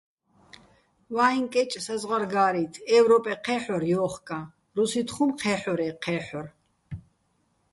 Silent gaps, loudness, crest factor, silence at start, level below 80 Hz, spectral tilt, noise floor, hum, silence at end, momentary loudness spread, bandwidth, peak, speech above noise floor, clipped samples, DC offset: none; -26 LUFS; 18 dB; 1.1 s; -62 dBFS; -5 dB/octave; -70 dBFS; none; 0.75 s; 16 LU; 11.5 kHz; -8 dBFS; 45 dB; under 0.1%; under 0.1%